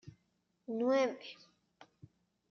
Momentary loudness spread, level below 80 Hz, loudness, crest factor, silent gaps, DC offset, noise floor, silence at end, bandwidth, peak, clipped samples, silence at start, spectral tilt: 23 LU; -82 dBFS; -34 LUFS; 18 dB; none; under 0.1%; -79 dBFS; 1.2 s; 6.8 kHz; -20 dBFS; under 0.1%; 0.05 s; -3.5 dB/octave